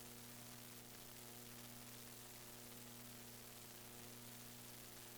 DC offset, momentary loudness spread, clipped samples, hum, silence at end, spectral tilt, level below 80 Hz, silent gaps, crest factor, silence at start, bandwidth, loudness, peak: under 0.1%; 1 LU; under 0.1%; 60 Hz at -65 dBFS; 0 s; -2.5 dB/octave; -74 dBFS; none; 14 dB; 0 s; over 20 kHz; -55 LUFS; -44 dBFS